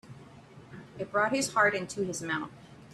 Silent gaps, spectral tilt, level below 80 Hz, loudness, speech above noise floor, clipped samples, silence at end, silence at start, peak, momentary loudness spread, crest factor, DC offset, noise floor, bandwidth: none; -3.5 dB/octave; -68 dBFS; -29 LUFS; 22 dB; under 0.1%; 0 s; 0.05 s; -12 dBFS; 24 LU; 20 dB; under 0.1%; -52 dBFS; 13.5 kHz